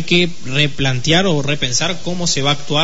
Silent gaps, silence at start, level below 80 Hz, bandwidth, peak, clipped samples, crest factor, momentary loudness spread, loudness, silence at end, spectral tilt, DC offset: none; 0 s; -40 dBFS; 8 kHz; -2 dBFS; under 0.1%; 14 dB; 4 LU; -16 LUFS; 0 s; -3.5 dB/octave; 8%